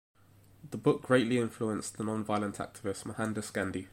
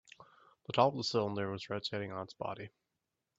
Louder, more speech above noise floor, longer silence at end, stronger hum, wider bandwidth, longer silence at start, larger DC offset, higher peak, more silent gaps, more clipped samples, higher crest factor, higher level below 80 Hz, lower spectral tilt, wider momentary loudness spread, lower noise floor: first, -33 LUFS vs -36 LUFS; second, 27 dB vs 52 dB; second, 0.05 s vs 0.7 s; neither; first, 16.5 kHz vs 8 kHz; first, 0.65 s vs 0.2 s; neither; first, -10 dBFS vs -14 dBFS; neither; neither; about the same, 22 dB vs 24 dB; first, -66 dBFS vs -76 dBFS; about the same, -5.5 dB/octave vs -5.5 dB/octave; second, 11 LU vs 16 LU; second, -60 dBFS vs -87 dBFS